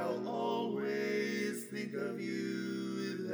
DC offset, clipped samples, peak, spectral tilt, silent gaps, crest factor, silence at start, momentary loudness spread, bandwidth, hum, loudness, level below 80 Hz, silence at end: under 0.1%; under 0.1%; -24 dBFS; -5.5 dB/octave; none; 12 dB; 0 s; 4 LU; over 20 kHz; none; -37 LUFS; -88 dBFS; 0 s